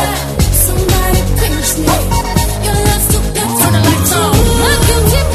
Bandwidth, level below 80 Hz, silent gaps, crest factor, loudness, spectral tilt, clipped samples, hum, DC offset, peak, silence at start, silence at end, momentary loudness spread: 14 kHz; -16 dBFS; none; 10 dB; -11 LUFS; -4 dB/octave; under 0.1%; none; under 0.1%; 0 dBFS; 0 s; 0 s; 4 LU